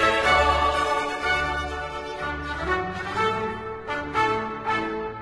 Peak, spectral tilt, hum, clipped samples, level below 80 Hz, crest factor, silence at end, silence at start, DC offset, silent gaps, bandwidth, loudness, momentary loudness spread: -6 dBFS; -4 dB/octave; none; under 0.1%; -40 dBFS; 18 dB; 0 s; 0 s; under 0.1%; none; 12.5 kHz; -25 LUFS; 12 LU